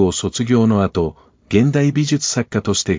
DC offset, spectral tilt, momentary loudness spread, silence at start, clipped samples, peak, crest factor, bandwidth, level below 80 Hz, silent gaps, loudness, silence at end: under 0.1%; -5.5 dB/octave; 6 LU; 0 s; under 0.1%; -2 dBFS; 16 dB; 7.8 kHz; -38 dBFS; none; -17 LUFS; 0 s